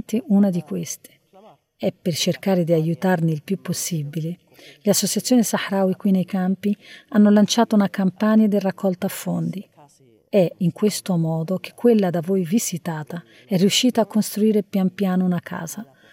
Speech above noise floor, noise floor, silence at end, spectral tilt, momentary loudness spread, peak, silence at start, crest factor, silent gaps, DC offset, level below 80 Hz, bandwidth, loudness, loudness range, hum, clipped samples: 34 dB; -54 dBFS; 0.3 s; -5.5 dB/octave; 12 LU; -6 dBFS; 0.1 s; 16 dB; none; under 0.1%; -74 dBFS; 17 kHz; -21 LUFS; 4 LU; none; under 0.1%